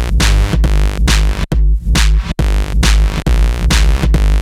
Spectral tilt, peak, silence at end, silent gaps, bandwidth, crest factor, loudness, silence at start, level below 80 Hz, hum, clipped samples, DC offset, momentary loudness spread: -4.5 dB/octave; -2 dBFS; 0 s; none; 13.5 kHz; 10 dB; -14 LUFS; 0 s; -12 dBFS; none; under 0.1%; under 0.1%; 3 LU